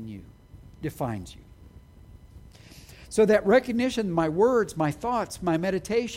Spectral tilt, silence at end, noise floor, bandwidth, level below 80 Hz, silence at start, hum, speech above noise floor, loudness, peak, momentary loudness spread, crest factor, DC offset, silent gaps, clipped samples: -6 dB/octave; 0 s; -50 dBFS; 16 kHz; -52 dBFS; 0 s; none; 25 dB; -25 LUFS; -8 dBFS; 16 LU; 18 dB; under 0.1%; none; under 0.1%